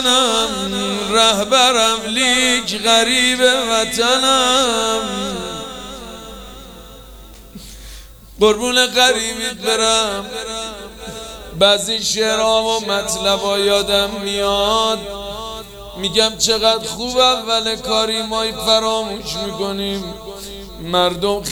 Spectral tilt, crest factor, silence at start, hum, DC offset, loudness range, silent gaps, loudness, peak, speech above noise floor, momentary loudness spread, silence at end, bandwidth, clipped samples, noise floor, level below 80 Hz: -1.5 dB/octave; 18 dB; 0 s; none; under 0.1%; 6 LU; none; -15 LUFS; 0 dBFS; 22 dB; 18 LU; 0 s; over 20 kHz; under 0.1%; -38 dBFS; -42 dBFS